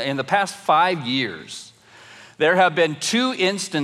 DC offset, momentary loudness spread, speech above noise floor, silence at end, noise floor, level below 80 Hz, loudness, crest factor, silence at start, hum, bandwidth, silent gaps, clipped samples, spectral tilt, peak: under 0.1%; 11 LU; 26 dB; 0 s; -46 dBFS; -76 dBFS; -20 LUFS; 16 dB; 0 s; none; 15 kHz; none; under 0.1%; -3.5 dB/octave; -4 dBFS